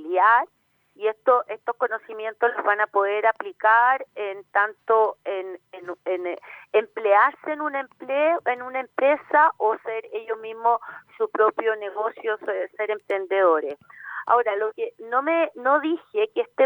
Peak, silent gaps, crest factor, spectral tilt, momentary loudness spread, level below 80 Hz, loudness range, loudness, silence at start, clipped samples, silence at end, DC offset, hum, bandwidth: -6 dBFS; none; 18 dB; -5 dB/octave; 14 LU; -84 dBFS; 3 LU; -23 LUFS; 0 s; under 0.1%; 0 s; under 0.1%; none; 19.5 kHz